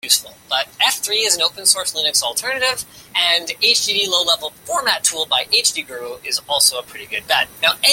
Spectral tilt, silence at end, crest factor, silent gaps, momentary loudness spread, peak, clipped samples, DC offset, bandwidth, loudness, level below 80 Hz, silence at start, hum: 1.5 dB/octave; 0 s; 18 dB; none; 9 LU; 0 dBFS; under 0.1%; under 0.1%; 17 kHz; -16 LUFS; -60 dBFS; 0.05 s; none